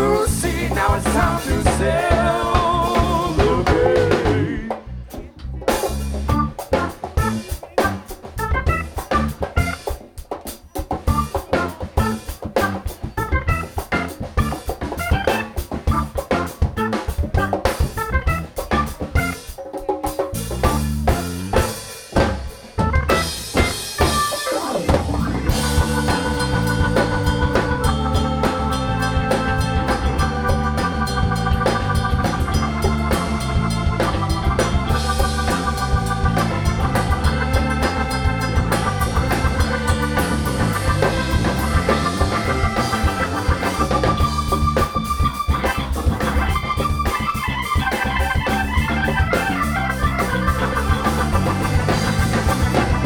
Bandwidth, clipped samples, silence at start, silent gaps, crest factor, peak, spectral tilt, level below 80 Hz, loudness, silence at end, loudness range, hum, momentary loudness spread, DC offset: 20 kHz; under 0.1%; 0 s; none; 18 dB; -2 dBFS; -5.5 dB/octave; -26 dBFS; -20 LUFS; 0 s; 4 LU; none; 6 LU; under 0.1%